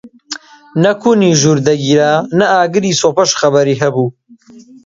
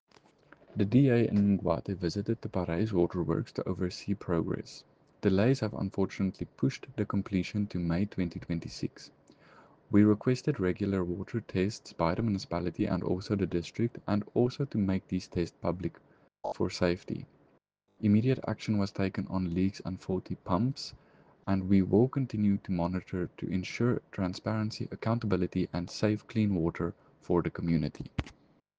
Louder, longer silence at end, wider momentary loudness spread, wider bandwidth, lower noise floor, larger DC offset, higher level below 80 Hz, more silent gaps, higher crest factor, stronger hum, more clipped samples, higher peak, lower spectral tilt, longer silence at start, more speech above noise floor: first, -12 LUFS vs -31 LUFS; second, 0.25 s vs 0.5 s; about the same, 12 LU vs 10 LU; about the same, 7.8 kHz vs 8 kHz; second, -40 dBFS vs -70 dBFS; neither; about the same, -54 dBFS vs -56 dBFS; neither; second, 12 dB vs 20 dB; neither; neither; first, 0 dBFS vs -10 dBFS; second, -4.5 dB/octave vs -7.5 dB/octave; second, 0.05 s vs 0.75 s; second, 29 dB vs 40 dB